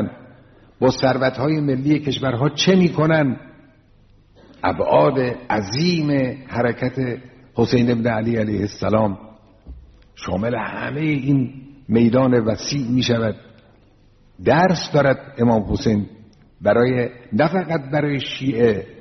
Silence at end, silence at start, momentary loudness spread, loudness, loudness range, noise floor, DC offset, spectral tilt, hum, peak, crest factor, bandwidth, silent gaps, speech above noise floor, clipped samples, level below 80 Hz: 0 s; 0 s; 9 LU; -19 LUFS; 3 LU; -52 dBFS; under 0.1%; -5.5 dB/octave; none; -2 dBFS; 18 dB; 6.4 kHz; none; 34 dB; under 0.1%; -46 dBFS